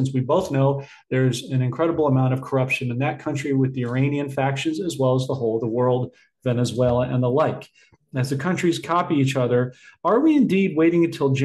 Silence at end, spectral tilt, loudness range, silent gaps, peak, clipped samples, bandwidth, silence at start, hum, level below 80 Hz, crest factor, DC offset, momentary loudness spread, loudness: 0 s; -7 dB/octave; 3 LU; none; -8 dBFS; under 0.1%; 12.5 kHz; 0 s; none; -56 dBFS; 14 dB; under 0.1%; 7 LU; -22 LUFS